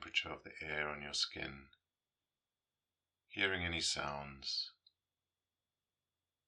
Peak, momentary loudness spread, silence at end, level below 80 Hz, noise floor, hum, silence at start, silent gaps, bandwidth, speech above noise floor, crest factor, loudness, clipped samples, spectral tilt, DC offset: -20 dBFS; 11 LU; 1.75 s; -68 dBFS; under -90 dBFS; none; 0 s; none; 10.5 kHz; over 49 dB; 24 dB; -39 LUFS; under 0.1%; -2 dB/octave; under 0.1%